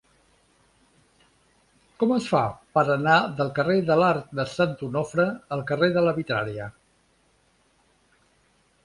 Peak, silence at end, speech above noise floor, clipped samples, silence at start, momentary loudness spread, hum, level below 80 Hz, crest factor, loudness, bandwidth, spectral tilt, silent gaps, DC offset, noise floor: -6 dBFS; 2.15 s; 41 dB; under 0.1%; 2 s; 9 LU; none; -60 dBFS; 20 dB; -24 LUFS; 11.5 kHz; -6.5 dB/octave; none; under 0.1%; -64 dBFS